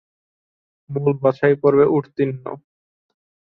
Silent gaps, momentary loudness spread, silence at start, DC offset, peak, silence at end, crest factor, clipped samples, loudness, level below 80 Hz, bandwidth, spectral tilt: none; 17 LU; 0.9 s; under 0.1%; -2 dBFS; 0.95 s; 18 dB; under 0.1%; -18 LUFS; -60 dBFS; 4.6 kHz; -10.5 dB/octave